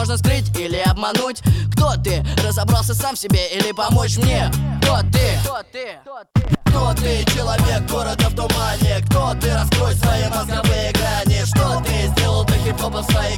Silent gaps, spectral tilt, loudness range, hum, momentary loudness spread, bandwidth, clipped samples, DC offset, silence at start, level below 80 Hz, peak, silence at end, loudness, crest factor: none; -5 dB/octave; 1 LU; none; 4 LU; 19 kHz; under 0.1%; under 0.1%; 0 s; -26 dBFS; -4 dBFS; 0 s; -18 LUFS; 14 dB